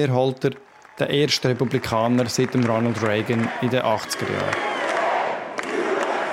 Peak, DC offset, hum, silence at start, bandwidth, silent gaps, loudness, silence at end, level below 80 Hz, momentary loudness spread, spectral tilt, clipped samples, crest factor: -6 dBFS; under 0.1%; none; 0 s; 16.5 kHz; none; -22 LUFS; 0 s; -58 dBFS; 6 LU; -5 dB/octave; under 0.1%; 16 dB